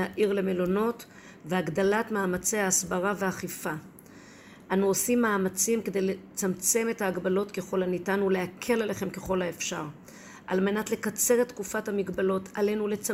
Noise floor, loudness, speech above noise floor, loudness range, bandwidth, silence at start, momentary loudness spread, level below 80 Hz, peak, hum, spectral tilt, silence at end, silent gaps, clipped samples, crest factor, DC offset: -50 dBFS; -28 LUFS; 22 dB; 3 LU; 16 kHz; 0 s; 9 LU; -60 dBFS; -12 dBFS; none; -4 dB/octave; 0 s; none; under 0.1%; 18 dB; under 0.1%